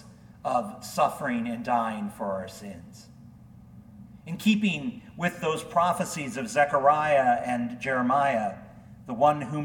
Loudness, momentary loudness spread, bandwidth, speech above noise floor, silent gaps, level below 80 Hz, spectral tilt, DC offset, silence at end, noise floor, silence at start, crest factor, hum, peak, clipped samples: -26 LUFS; 16 LU; 18 kHz; 23 dB; none; -60 dBFS; -5 dB/octave; under 0.1%; 0 s; -49 dBFS; 0.05 s; 20 dB; none; -8 dBFS; under 0.1%